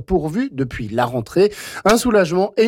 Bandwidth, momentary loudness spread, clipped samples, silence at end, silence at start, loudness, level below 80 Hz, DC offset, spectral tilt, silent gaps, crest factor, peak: 17 kHz; 8 LU; under 0.1%; 0 s; 0 s; -18 LUFS; -40 dBFS; under 0.1%; -5.5 dB/octave; none; 12 dB; -6 dBFS